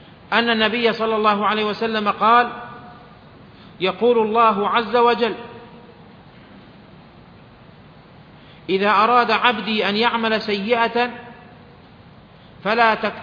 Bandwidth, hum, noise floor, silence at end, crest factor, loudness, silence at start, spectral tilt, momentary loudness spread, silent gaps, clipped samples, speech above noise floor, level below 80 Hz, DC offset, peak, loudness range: 5.4 kHz; none; -45 dBFS; 0 s; 20 dB; -18 LUFS; 0.3 s; -6 dB/octave; 9 LU; none; under 0.1%; 27 dB; -58 dBFS; under 0.1%; 0 dBFS; 6 LU